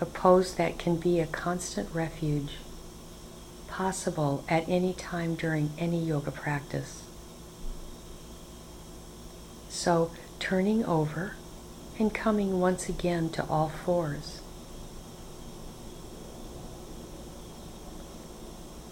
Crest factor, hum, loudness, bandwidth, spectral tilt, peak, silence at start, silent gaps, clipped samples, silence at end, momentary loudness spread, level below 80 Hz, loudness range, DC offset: 24 dB; none; -29 LUFS; 17 kHz; -6 dB/octave; -8 dBFS; 0 s; none; under 0.1%; 0 s; 19 LU; -48 dBFS; 15 LU; under 0.1%